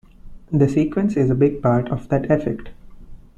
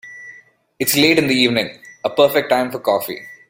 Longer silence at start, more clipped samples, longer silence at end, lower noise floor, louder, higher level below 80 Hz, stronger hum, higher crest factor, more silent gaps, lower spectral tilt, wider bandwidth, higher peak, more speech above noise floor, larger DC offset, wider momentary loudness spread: first, 0.25 s vs 0.05 s; neither; about the same, 0.2 s vs 0.15 s; second, -38 dBFS vs -46 dBFS; second, -19 LUFS vs -16 LUFS; first, -40 dBFS vs -56 dBFS; neither; about the same, 16 dB vs 18 dB; neither; first, -9.5 dB/octave vs -3.5 dB/octave; second, 8.6 kHz vs 16.5 kHz; second, -4 dBFS vs 0 dBFS; second, 20 dB vs 30 dB; neither; second, 7 LU vs 15 LU